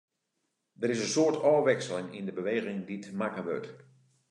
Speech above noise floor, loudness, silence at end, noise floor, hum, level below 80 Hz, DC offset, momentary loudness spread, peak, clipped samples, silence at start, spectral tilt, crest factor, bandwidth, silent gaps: 51 dB; -30 LUFS; 0.55 s; -81 dBFS; none; -82 dBFS; under 0.1%; 13 LU; -12 dBFS; under 0.1%; 0.8 s; -4.5 dB/octave; 18 dB; 11 kHz; none